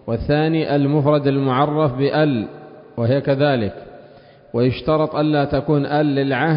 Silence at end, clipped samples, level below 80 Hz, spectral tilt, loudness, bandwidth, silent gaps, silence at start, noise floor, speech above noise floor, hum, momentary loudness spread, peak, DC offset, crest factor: 0 s; under 0.1%; -44 dBFS; -12.5 dB/octave; -18 LUFS; 5.4 kHz; none; 0.05 s; -45 dBFS; 28 dB; none; 7 LU; -4 dBFS; under 0.1%; 14 dB